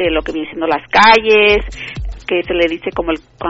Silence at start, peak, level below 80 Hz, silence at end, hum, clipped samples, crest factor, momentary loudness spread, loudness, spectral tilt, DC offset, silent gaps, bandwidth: 0 s; 0 dBFS; -32 dBFS; 0 s; none; under 0.1%; 14 dB; 18 LU; -13 LUFS; -1.5 dB/octave; under 0.1%; none; 8 kHz